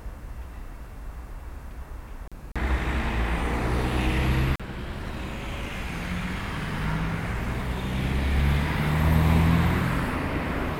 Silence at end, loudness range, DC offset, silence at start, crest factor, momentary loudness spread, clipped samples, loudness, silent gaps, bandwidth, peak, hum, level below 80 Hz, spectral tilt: 0 s; 7 LU; under 0.1%; 0 s; 16 dB; 19 LU; under 0.1%; -27 LUFS; none; 16.5 kHz; -10 dBFS; none; -32 dBFS; -6.5 dB/octave